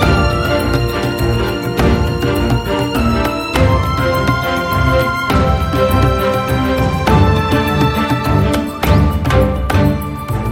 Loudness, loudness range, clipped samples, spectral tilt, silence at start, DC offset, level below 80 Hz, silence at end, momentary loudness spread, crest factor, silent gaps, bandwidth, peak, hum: -14 LUFS; 2 LU; under 0.1%; -6.5 dB/octave; 0 s; under 0.1%; -22 dBFS; 0 s; 4 LU; 12 dB; none; 17 kHz; 0 dBFS; none